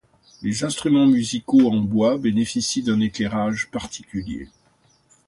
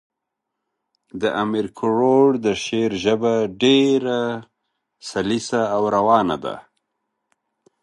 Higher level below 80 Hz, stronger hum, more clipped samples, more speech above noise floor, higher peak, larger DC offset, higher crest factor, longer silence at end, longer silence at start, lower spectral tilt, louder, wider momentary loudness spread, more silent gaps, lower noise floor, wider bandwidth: first, -50 dBFS vs -58 dBFS; neither; neither; second, 40 dB vs 62 dB; second, -6 dBFS vs -2 dBFS; neither; about the same, 16 dB vs 20 dB; second, 0.8 s vs 1.2 s; second, 0.4 s vs 1.15 s; about the same, -5 dB/octave vs -5 dB/octave; about the same, -21 LUFS vs -19 LUFS; about the same, 14 LU vs 13 LU; neither; second, -60 dBFS vs -81 dBFS; about the same, 11.5 kHz vs 11.5 kHz